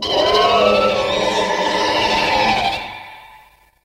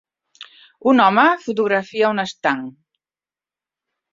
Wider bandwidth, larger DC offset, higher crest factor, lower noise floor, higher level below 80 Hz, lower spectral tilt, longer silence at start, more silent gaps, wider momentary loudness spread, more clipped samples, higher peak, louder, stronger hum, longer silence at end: first, 16 kHz vs 7.6 kHz; neither; about the same, 16 dB vs 18 dB; second, -48 dBFS vs under -90 dBFS; first, -42 dBFS vs -66 dBFS; second, -3 dB/octave vs -5.5 dB/octave; second, 0 s vs 0.4 s; neither; about the same, 8 LU vs 9 LU; neither; about the same, -2 dBFS vs -2 dBFS; about the same, -16 LUFS vs -17 LUFS; neither; second, 0.5 s vs 1.4 s